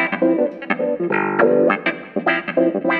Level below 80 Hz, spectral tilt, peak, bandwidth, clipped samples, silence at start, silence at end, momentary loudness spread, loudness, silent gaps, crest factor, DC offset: -66 dBFS; -9 dB/octave; 0 dBFS; 4.9 kHz; under 0.1%; 0 s; 0 s; 7 LU; -18 LUFS; none; 18 dB; under 0.1%